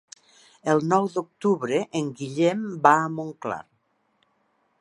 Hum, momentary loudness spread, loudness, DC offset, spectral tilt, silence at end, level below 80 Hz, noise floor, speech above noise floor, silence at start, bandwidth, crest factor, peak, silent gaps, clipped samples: none; 13 LU; -24 LUFS; under 0.1%; -6 dB/octave; 1.2 s; -72 dBFS; -69 dBFS; 46 dB; 0.65 s; 11.5 kHz; 24 dB; -2 dBFS; none; under 0.1%